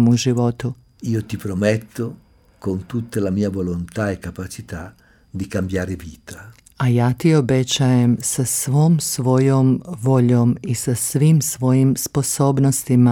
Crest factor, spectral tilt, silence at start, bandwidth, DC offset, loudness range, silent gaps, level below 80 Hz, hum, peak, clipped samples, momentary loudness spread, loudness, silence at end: 16 dB; -6 dB/octave; 0 s; 17.5 kHz; under 0.1%; 8 LU; none; -48 dBFS; none; -4 dBFS; under 0.1%; 15 LU; -19 LUFS; 0 s